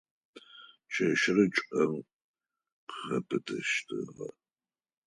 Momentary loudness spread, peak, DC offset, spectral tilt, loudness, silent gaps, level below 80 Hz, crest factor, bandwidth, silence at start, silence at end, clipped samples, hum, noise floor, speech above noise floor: 19 LU; -12 dBFS; under 0.1%; -4.5 dB/octave; -30 LUFS; 2.13-2.34 s, 2.72-2.87 s; -74 dBFS; 22 dB; 11 kHz; 0.35 s; 0.75 s; under 0.1%; none; under -90 dBFS; over 60 dB